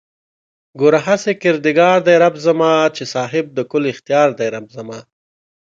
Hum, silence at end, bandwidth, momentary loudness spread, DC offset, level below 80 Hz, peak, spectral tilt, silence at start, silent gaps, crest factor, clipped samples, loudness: none; 0.65 s; 7.6 kHz; 14 LU; under 0.1%; -64 dBFS; 0 dBFS; -5.5 dB/octave; 0.75 s; none; 16 dB; under 0.1%; -15 LUFS